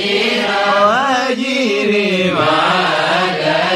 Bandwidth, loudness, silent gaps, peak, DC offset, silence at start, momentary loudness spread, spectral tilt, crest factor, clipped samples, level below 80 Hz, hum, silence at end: 14 kHz; -14 LUFS; none; -2 dBFS; under 0.1%; 0 s; 3 LU; -4 dB/octave; 12 dB; under 0.1%; -56 dBFS; none; 0 s